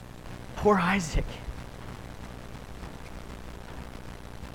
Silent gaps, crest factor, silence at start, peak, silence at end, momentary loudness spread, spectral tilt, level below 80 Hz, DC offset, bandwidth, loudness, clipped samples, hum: none; 22 dB; 0 s; -10 dBFS; 0 s; 19 LU; -5.5 dB/octave; -40 dBFS; 0.3%; 16.5 kHz; -28 LUFS; under 0.1%; 60 Hz at -50 dBFS